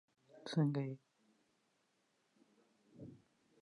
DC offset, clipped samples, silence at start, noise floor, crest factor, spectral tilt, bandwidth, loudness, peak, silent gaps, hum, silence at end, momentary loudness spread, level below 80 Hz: under 0.1%; under 0.1%; 0.35 s; -80 dBFS; 20 dB; -7.5 dB/octave; 10.5 kHz; -39 LUFS; -26 dBFS; none; none; 0.45 s; 21 LU; -88 dBFS